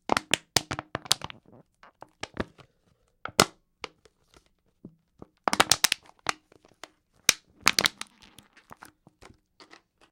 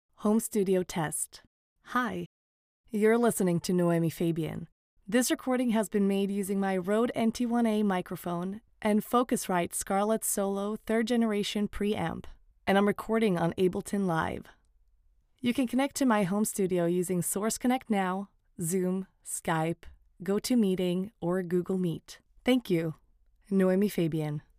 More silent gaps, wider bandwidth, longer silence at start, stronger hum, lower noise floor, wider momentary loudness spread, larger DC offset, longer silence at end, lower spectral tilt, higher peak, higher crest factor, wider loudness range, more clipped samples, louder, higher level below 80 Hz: second, none vs 1.47-1.76 s, 2.26-2.84 s, 4.72-4.97 s; about the same, 16.5 kHz vs 16 kHz; about the same, 0.1 s vs 0.2 s; neither; about the same, -69 dBFS vs -66 dBFS; first, 21 LU vs 9 LU; neither; first, 2.2 s vs 0.2 s; second, -1 dB/octave vs -5.5 dB/octave; first, 0 dBFS vs -12 dBFS; first, 32 dB vs 18 dB; first, 6 LU vs 2 LU; neither; first, -26 LUFS vs -29 LUFS; about the same, -58 dBFS vs -58 dBFS